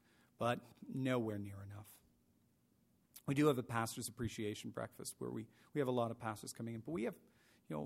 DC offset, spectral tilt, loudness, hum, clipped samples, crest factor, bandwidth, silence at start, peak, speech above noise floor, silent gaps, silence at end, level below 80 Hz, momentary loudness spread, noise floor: under 0.1%; -5.5 dB/octave; -42 LUFS; none; under 0.1%; 22 dB; 16 kHz; 0.4 s; -22 dBFS; 34 dB; none; 0 s; -72 dBFS; 15 LU; -75 dBFS